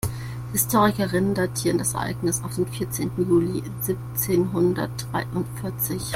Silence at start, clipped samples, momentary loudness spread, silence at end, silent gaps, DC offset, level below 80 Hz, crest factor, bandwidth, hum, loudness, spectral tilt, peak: 0.05 s; under 0.1%; 7 LU; 0 s; none; under 0.1%; -46 dBFS; 18 dB; 16.5 kHz; none; -24 LUFS; -5 dB/octave; -6 dBFS